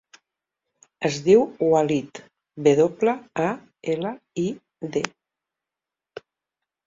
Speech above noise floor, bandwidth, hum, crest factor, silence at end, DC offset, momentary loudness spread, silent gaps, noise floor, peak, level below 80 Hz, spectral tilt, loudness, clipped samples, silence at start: 67 dB; 7.8 kHz; none; 22 dB; 1.8 s; under 0.1%; 24 LU; none; -88 dBFS; -2 dBFS; -66 dBFS; -6 dB/octave; -23 LUFS; under 0.1%; 1 s